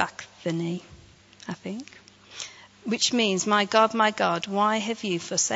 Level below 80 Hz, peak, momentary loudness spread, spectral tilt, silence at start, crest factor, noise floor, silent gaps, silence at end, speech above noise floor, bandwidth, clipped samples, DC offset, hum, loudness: -68 dBFS; -6 dBFS; 17 LU; -3 dB/octave; 0 s; 22 dB; -51 dBFS; none; 0 s; 26 dB; 8 kHz; under 0.1%; under 0.1%; none; -24 LUFS